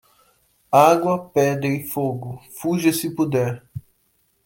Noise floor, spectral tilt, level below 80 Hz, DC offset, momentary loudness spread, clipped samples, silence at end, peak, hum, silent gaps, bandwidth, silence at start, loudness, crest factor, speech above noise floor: -65 dBFS; -6 dB/octave; -60 dBFS; under 0.1%; 18 LU; under 0.1%; 0.65 s; -2 dBFS; none; none; 17 kHz; 0.7 s; -20 LUFS; 20 dB; 46 dB